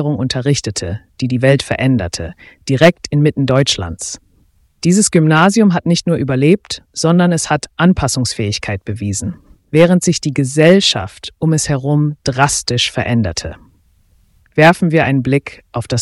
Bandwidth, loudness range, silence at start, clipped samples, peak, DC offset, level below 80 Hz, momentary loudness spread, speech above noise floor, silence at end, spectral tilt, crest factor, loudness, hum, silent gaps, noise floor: 12 kHz; 3 LU; 0 s; under 0.1%; 0 dBFS; under 0.1%; -40 dBFS; 12 LU; 40 dB; 0 s; -5 dB/octave; 14 dB; -14 LUFS; none; none; -53 dBFS